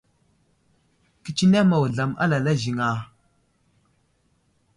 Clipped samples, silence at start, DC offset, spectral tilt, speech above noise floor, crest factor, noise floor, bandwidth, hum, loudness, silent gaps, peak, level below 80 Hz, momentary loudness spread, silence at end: under 0.1%; 1.25 s; under 0.1%; -6.5 dB/octave; 46 dB; 16 dB; -66 dBFS; 11 kHz; none; -22 LUFS; none; -10 dBFS; -58 dBFS; 14 LU; 1.7 s